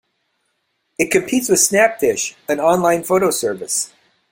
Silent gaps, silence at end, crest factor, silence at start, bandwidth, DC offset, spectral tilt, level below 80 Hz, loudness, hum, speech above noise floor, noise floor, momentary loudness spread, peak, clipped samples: none; 0.45 s; 18 dB; 1 s; 16.5 kHz; under 0.1%; -3 dB/octave; -58 dBFS; -16 LUFS; none; 53 dB; -69 dBFS; 9 LU; 0 dBFS; under 0.1%